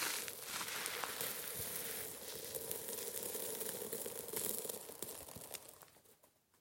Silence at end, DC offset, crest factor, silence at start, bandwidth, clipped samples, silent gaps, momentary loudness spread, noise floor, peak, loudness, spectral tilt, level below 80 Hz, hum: 0.35 s; under 0.1%; 30 dB; 0 s; 17 kHz; under 0.1%; none; 9 LU; -71 dBFS; -14 dBFS; -42 LUFS; -1 dB/octave; -76 dBFS; none